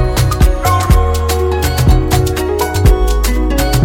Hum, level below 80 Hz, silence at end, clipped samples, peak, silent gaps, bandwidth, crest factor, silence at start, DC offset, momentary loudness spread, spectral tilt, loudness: none; -14 dBFS; 0 s; under 0.1%; 0 dBFS; none; 17 kHz; 10 dB; 0 s; under 0.1%; 3 LU; -5.5 dB/octave; -13 LUFS